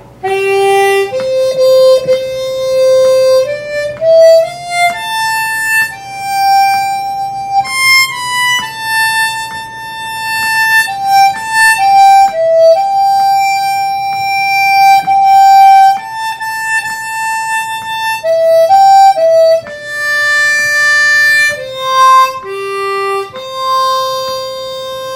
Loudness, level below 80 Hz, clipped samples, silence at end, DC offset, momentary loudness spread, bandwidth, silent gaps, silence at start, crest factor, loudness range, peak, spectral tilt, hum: -9 LUFS; -52 dBFS; under 0.1%; 0 s; under 0.1%; 12 LU; 16.5 kHz; none; 0.2 s; 10 dB; 4 LU; 0 dBFS; -1.5 dB/octave; none